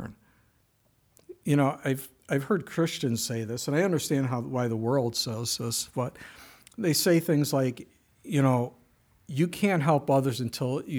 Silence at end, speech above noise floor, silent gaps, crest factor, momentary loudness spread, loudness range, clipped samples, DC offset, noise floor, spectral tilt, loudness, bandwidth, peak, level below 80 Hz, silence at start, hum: 0 s; 41 dB; none; 18 dB; 11 LU; 2 LU; under 0.1%; under 0.1%; -68 dBFS; -5.5 dB/octave; -27 LUFS; over 20 kHz; -10 dBFS; -66 dBFS; 0 s; none